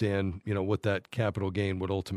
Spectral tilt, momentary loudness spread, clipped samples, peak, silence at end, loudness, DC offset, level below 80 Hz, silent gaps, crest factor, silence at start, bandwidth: -7.5 dB/octave; 3 LU; under 0.1%; -14 dBFS; 0 s; -31 LUFS; under 0.1%; -56 dBFS; none; 16 dB; 0 s; 12 kHz